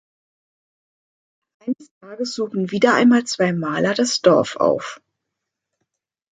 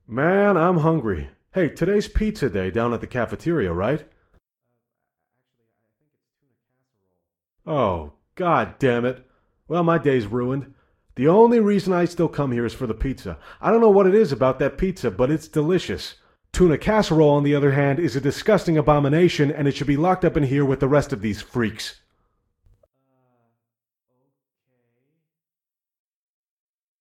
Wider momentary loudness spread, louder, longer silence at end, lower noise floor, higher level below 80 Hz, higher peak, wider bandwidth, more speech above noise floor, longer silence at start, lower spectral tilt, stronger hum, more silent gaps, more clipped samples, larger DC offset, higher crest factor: first, 14 LU vs 11 LU; about the same, -19 LUFS vs -20 LUFS; second, 1.35 s vs 5.1 s; second, -81 dBFS vs under -90 dBFS; second, -66 dBFS vs -42 dBFS; about the same, -2 dBFS vs -4 dBFS; second, 9.4 kHz vs 14 kHz; second, 63 dB vs over 70 dB; first, 1.65 s vs 0.1 s; second, -4.5 dB/octave vs -7 dB/octave; neither; first, 1.91-2.01 s vs none; neither; neither; about the same, 20 dB vs 18 dB